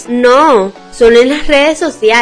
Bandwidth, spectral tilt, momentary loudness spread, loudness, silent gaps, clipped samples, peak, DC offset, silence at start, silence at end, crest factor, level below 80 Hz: 10.5 kHz; -3.5 dB/octave; 6 LU; -8 LUFS; none; 2%; 0 dBFS; under 0.1%; 0 s; 0 s; 8 dB; -30 dBFS